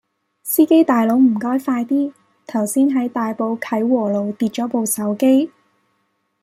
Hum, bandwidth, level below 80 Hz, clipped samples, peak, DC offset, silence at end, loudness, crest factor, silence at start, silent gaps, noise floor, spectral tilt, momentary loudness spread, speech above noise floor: none; 16 kHz; -68 dBFS; under 0.1%; -2 dBFS; under 0.1%; 0.95 s; -18 LUFS; 16 dB; 0.45 s; none; -68 dBFS; -5 dB/octave; 9 LU; 51 dB